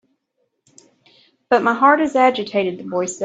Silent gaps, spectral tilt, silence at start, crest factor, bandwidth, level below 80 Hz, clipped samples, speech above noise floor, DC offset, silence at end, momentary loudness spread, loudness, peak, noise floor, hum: none; -4 dB/octave; 1.5 s; 18 dB; 9.2 kHz; -66 dBFS; under 0.1%; 54 dB; under 0.1%; 0 s; 9 LU; -17 LUFS; 0 dBFS; -71 dBFS; none